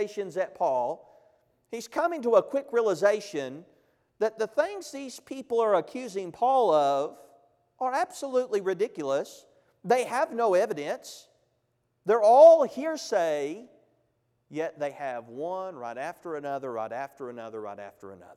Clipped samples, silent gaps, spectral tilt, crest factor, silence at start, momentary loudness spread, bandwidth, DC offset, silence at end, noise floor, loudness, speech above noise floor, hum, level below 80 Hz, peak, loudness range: under 0.1%; none; -4.5 dB/octave; 22 dB; 0 s; 16 LU; 13.5 kHz; under 0.1%; 0.05 s; -75 dBFS; -26 LUFS; 48 dB; none; -80 dBFS; -6 dBFS; 12 LU